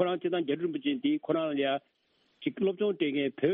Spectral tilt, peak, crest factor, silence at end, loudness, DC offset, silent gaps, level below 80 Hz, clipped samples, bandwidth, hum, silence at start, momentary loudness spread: -4 dB/octave; -14 dBFS; 16 dB; 0 s; -31 LUFS; under 0.1%; none; -76 dBFS; under 0.1%; 4 kHz; none; 0 s; 4 LU